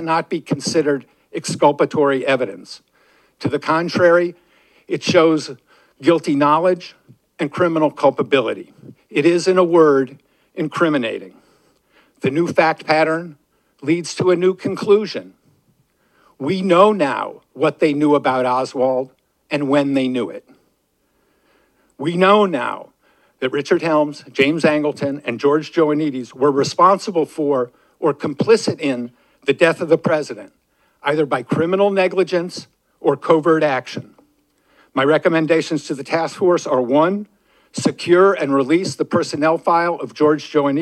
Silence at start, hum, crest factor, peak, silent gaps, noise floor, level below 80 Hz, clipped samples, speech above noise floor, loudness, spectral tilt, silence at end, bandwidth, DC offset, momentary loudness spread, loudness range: 0 s; none; 18 dB; 0 dBFS; none; -65 dBFS; -70 dBFS; under 0.1%; 48 dB; -17 LUFS; -5.5 dB/octave; 0 s; 12 kHz; under 0.1%; 12 LU; 3 LU